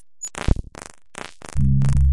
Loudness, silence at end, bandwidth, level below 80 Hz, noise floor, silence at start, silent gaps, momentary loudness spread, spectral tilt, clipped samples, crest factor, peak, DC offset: -23 LUFS; 0 s; 11.5 kHz; -26 dBFS; -41 dBFS; 0 s; none; 20 LU; -6 dB/octave; under 0.1%; 18 dB; -2 dBFS; under 0.1%